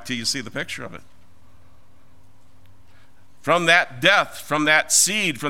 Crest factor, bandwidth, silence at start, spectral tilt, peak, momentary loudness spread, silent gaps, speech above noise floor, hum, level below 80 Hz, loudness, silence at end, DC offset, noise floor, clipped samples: 22 dB; 16.5 kHz; 0 s; -1.5 dB/octave; 0 dBFS; 15 LU; none; 35 dB; none; -60 dBFS; -18 LUFS; 0 s; 1%; -56 dBFS; under 0.1%